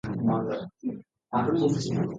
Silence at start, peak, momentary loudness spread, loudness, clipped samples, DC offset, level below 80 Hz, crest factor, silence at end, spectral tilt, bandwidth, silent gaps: 0.05 s; -12 dBFS; 11 LU; -28 LUFS; under 0.1%; under 0.1%; -58 dBFS; 16 dB; 0 s; -7 dB/octave; 9.2 kHz; none